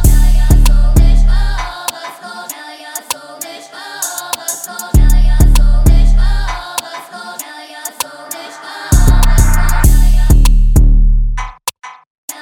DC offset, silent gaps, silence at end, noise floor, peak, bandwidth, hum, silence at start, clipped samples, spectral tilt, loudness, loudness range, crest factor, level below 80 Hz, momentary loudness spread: under 0.1%; 12.07-12.28 s; 0 s; -29 dBFS; 0 dBFS; 17 kHz; none; 0 s; 0.2%; -4.5 dB/octave; -14 LUFS; 7 LU; 10 dB; -10 dBFS; 16 LU